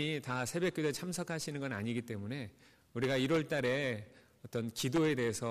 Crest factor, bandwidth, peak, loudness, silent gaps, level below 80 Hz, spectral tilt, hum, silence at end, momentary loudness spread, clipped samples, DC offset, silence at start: 12 dB; 15.5 kHz; -24 dBFS; -36 LUFS; none; -68 dBFS; -5 dB/octave; none; 0 s; 11 LU; under 0.1%; under 0.1%; 0 s